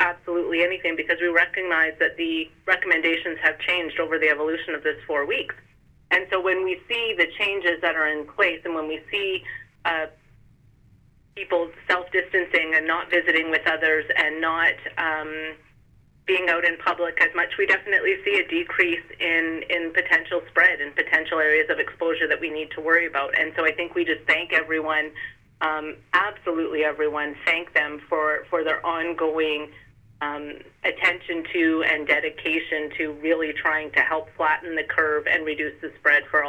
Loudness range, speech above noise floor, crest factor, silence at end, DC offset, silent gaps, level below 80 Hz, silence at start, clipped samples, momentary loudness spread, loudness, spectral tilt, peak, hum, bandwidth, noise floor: 4 LU; 32 dB; 18 dB; 0 s; under 0.1%; none; -60 dBFS; 0 s; under 0.1%; 8 LU; -22 LUFS; -4.5 dB/octave; -6 dBFS; none; 9.6 kHz; -56 dBFS